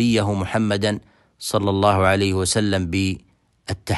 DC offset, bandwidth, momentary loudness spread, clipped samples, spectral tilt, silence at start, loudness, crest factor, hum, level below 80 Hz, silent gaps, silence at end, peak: under 0.1%; 12.5 kHz; 14 LU; under 0.1%; -5 dB/octave; 0 s; -20 LUFS; 18 dB; none; -46 dBFS; none; 0 s; -4 dBFS